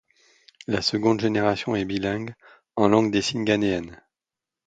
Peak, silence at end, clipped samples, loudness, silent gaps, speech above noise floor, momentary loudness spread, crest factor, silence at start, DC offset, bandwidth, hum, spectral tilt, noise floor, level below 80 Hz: -4 dBFS; 0.7 s; under 0.1%; -23 LUFS; none; 66 dB; 13 LU; 22 dB; 0.7 s; under 0.1%; 9.2 kHz; none; -5.5 dB/octave; -89 dBFS; -54 dBFS